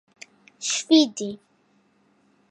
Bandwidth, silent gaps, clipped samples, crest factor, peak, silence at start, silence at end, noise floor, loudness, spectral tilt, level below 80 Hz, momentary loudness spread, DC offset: 9.6 kHz; none; under 0.1%; 20 dB; -6 dBFS; 0.6 s; 1.15 s; -64 dBFS; -22 LUFS; -2.5 dB/octave; -78 dBFS; 16 LU; under 0.1%